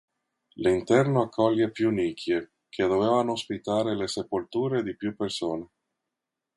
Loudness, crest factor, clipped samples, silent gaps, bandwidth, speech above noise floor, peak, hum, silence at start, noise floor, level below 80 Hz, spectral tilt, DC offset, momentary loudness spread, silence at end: -27 LUFS; 20 dB; under 0.1%; none; 11.5 kHz; 60 dB; -8 dBFS; none; 0.6 s; -86 dBFS; -60 dBFS; -6 dB/octave; under 0.1%; 9 LU; 0.9 s